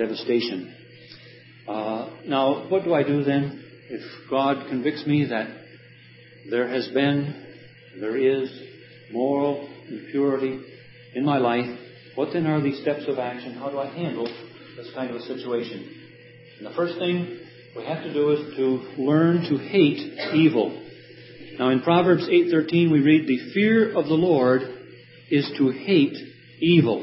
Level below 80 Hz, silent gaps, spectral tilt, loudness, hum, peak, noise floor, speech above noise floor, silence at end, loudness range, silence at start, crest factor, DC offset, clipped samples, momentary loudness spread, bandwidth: -70 dBFS; none; -11 dB/octave; -23 LUFS; none; -4 dBFS; -49 dBFS; 26 dB; 0 s; 9 LU; 0 s; 18 dB; under 0.1%; under 0.1%; 19 LU; 5.8 kHz